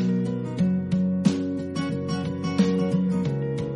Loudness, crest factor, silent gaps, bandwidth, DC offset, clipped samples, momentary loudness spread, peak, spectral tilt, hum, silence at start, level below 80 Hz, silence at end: -25 LUFS; 18 dB; none; 11 kHz; under 0.1%; under 0.1%; 6 LU; -8 dBFS; -7.5 dB/octave; none; 0 s; -56 dBFS; 0 s